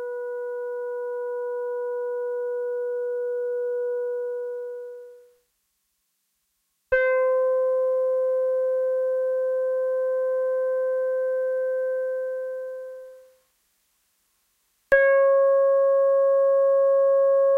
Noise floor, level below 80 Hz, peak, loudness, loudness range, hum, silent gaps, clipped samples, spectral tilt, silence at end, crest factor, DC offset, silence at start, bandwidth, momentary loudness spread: -74 dBFS; -62 dBFS; -8 dBFS; -24 LUFS; 10 LU; none; none; under 0.1%; -4 dB/octave; 0 s; 16 dB; under 0.1%; 0 s; 3.5 kHz; 12 LU